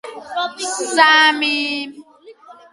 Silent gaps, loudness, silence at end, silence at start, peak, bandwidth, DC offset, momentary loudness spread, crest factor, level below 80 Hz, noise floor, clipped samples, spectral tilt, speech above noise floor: none; -15 LUFS; 0.2 s; 0.05 s; 0 dBFS; 11.5 kHz; under 0.1%; 16 LU; 18 dB; -72 dBFS; -43 dBFS; under 0.1%; 0.5 dB/octave; 27 dB